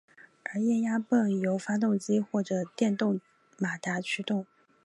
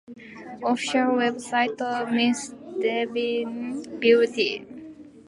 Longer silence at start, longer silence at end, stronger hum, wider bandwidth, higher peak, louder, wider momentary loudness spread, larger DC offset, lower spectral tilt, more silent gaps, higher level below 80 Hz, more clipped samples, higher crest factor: first, 0.45 s vs 0.1 s; first, 0.4 s vs 0.05 s; neither; about the same, 11.5 kHz vs 11.5 kHz; second, -12 dBFS vs -6 dBFS; second, -29 LUFS vs -24 LUFS; second, 8 LU vs 21 LU; neither; first, -6 dB/octave vs -3.5 dB/octave; neither; second, -80 dBFS vs -70 dBFS; neither; about the same, 16 dB vs 20 dB